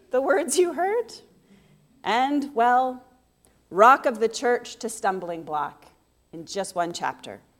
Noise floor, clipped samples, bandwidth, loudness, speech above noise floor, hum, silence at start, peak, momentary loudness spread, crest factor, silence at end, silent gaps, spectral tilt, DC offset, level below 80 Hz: -62 dBFS; under 0.1%; 17 kHz; -23 LUFS; 39 dB; none; 0.15 s; -2 dBFS; 16 LU; 22 dB; 0.2 s; none; -3 dB/octave; under 0.1%; -68 dBFS